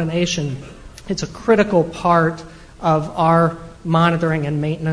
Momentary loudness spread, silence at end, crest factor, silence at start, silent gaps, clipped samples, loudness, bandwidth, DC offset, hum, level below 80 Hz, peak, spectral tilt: 14 LU; 0 s; 18 dB; 0 s; none; under 0.1%; -18 LUFS; 10.5 kHz; under 0.1%; none; -42 dBFS; 0 dBFS; -6 dB/octave